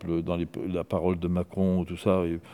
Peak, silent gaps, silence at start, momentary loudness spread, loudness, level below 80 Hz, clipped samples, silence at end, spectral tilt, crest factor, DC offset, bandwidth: -8 dBFS; none; 0 s; 5 LU; -28 LUFS; -54 dBFS; under 0.1%; 0 s; -8.5 dB/octave; 18 dB; under 0.1%; 12 kHz